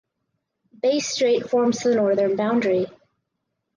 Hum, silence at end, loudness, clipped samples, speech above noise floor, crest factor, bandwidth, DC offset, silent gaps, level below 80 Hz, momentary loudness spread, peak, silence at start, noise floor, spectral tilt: none; 0.9 s; -21 LUFS; under 0.1%; 58 dB; 12 dB; 10 kHz; under 0.1%; none; -68 dBFS; 5 LU; -10 dBFS; 0.85 s; -78 dBFS; -4.5 dB/octave